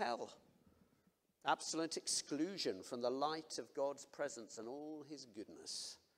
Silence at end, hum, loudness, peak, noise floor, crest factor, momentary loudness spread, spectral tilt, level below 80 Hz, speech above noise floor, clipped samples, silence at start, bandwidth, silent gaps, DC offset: 0.2 s; none; -43 LUFS; -22 dBFS; -78 dBFS; 22 dB; 13 LU; -2.5 dB/octave; under -90 dBFS; 34 dB; under 0.1%; 0 s; 16 kHz; none; under 0.1%